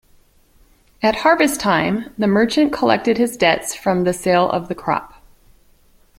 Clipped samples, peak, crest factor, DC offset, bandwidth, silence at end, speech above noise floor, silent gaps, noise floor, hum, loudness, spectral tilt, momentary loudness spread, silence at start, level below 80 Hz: under 0.1%; 0 dBFS; 18 dB; under 0.1%; 16.5 kHz; 1.1 s; 36 dB; none; -53 dBFS; none; -17 LUFS; -4.5 dB/octave; 7 LU; 1 s; -50 dBFS